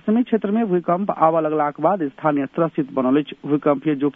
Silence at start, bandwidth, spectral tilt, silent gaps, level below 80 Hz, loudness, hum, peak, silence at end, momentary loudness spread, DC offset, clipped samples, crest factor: 0.05 s; 3.8 kHz; -10.5 dB/octave; none; -68 dBFS; -20 LUFS; none; -2 dBFS; 0.05 s; 4 LU; under 0.1%; under 0.1%; 18 dB